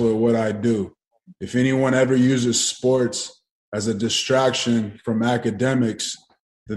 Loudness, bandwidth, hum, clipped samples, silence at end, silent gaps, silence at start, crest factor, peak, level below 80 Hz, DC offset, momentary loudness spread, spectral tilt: -21 LUFS; 12.5 kHz; none; under 0.1%; 0 s; 1.07-1.11 s, 3.51-3.72 s, 6.40-6.66 s; 0 s; 16 dB; -6 dBFS; -60 dBFS; under 0.1%; 10 LU; -4.5 dB/octave